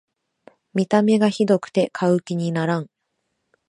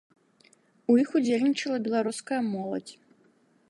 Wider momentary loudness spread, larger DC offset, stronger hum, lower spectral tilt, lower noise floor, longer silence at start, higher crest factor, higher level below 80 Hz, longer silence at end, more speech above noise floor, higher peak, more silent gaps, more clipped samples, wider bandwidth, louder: second, 9 LU vs 13 LU; neither; neither; first, -7 dB/octave vs -5 dB/octave; first, -75 dBFS vs -64 dBFS; second, 0.75 s vs 0.9 s; about the same, 18 dB vs 18 dB; first, -70 dBFS vs -80 dBFS; about the same, 0.85 s vs 0.75 s; first, 56 dB vs 38 dB; first, -4 dBFS vs -12 dBFS; neither; neither; about the same, 10.5 kHz vs 11.5 kHz; first, -20 LUFS vs -27 LUFS